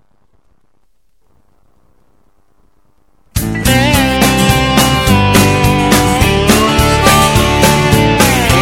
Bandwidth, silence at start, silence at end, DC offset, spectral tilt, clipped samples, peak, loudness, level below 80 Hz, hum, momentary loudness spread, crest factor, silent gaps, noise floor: 18 kHz; 3.35 s; 0 s; 0.3%; -4.5 dB/octave; 0.3%; 0 dBFS; -9 LUFS; -24 dBFS; none; 2 LU; 12 dB; none; -61 dBFS